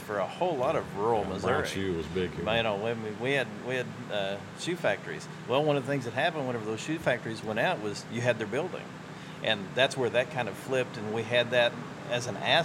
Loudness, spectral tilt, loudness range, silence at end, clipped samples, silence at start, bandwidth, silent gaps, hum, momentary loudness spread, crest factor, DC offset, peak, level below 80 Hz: -30 LUFS; -4.5 dB/octave; 2 LU; 0 s; under 0.1%; 0 s; 16 kHz; none; none; 8 LU; 20 dB; under 0.1%; -10 dBFS; -60 dBFS